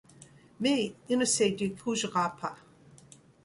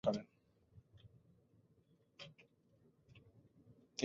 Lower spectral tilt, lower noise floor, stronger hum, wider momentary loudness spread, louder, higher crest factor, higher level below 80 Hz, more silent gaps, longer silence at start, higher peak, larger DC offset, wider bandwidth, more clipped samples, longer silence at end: second, -3.5 dB/octave vs -5 dB/octave; second, -56 dBFS vs -74 dBFS; neither; second, 7 LU vs 21 LU; first, -29 LUFS vs -48 LUFS; second, 18 dB vs 26 dB; first, -68 dBFS vs -78 dBFS; neither; first, 0.2 s vs 0.05 s; first, -14 dBFS vs -22 dBFS; neither; first, 11.5 kHz vs 7.4 kHz; neither; first, 0.9 s vs 0 s